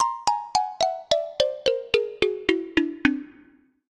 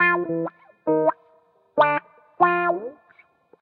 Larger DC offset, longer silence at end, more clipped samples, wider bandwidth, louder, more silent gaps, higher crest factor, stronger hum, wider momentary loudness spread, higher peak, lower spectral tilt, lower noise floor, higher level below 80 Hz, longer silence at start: neither; about the same, 0.6 s vs 0.7 s; neither; first, 12.5 kHz vs 4.9 kHz; about the same, -25 LUFS vs -23 LUFS; neither; about the same, 22 dB vs 20 dB; neither; second, 3 LU vs 11 LU; about the same, -2 dBFS vs -4 dBFS; second, -3 dB/octave vs -9 dB/octave; about the same, -56 dBFS vs -59 dBFS; first, -54 dBFS vs -76 dBFS; about the same, 0 s vs 0 s